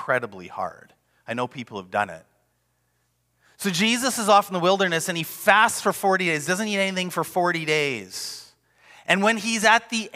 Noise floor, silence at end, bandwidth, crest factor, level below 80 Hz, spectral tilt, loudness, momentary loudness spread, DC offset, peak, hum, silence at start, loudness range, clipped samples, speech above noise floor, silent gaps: -70 dBFS; 0.05 s; 16 kHz; 20 dB; -70 dBFS; -3 dB/octave; -22 LUFS; 14 LU; under 0.1%; -4 dBFS; none; 0 s; 10 LU; under 0.1%; 47 dB; none